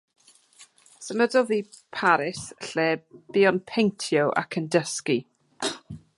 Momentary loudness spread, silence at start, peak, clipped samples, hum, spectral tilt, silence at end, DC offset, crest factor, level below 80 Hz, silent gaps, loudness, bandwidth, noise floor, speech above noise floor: 10 LU; 0.6 s; -6 dBFS; under 0.1%; none; -4.5 dB/octave; 0.2 s; under 0.1%; 20 dB; -68 dBFS; none; -25 LUFS; 11.5 kHz; -55 dBFS; 31 dB